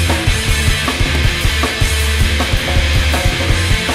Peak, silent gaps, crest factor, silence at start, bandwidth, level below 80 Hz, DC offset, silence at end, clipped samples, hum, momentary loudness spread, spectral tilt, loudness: -2 dBFS; none; 12 dB; 0 s; 16 kHz; -18 dBFS; under 0.1%; 0 s; under 0.1%; none; 1 LU; -4 dB/octave; -14 LUFS